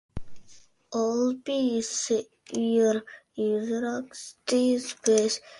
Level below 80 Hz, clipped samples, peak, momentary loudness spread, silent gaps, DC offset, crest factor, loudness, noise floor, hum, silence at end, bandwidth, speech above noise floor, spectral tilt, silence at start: -56 dBFS; under 0.1%; -8 dBFS; 12 LU; none; under 0.1%; 20 dB; -27 LUFS; -54 dBFS; none; 0 s; 11.5 kHz; 28 dB; -3.5 dB/octave; 0.15 s